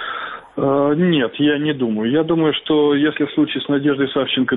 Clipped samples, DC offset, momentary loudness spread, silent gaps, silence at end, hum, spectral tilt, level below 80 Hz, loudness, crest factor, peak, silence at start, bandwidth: under 0.1%; under 0.1%; 4 LU; none; 0 s; none; -10 dB/octave; -58 dBFS; -18 LUFS; 10 dB; -6 dBFS; 0 s; 4 kHz